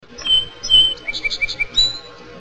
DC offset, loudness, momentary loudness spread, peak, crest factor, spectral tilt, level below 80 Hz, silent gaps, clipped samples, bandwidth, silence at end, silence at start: 0.4%; -15 LUFS; 10 LU; -4 dBFS; 16 dB; 0 dB/octave; -38 dBFS; none; under 0.1%; 9.2 kHz; 0 s; 0.1 s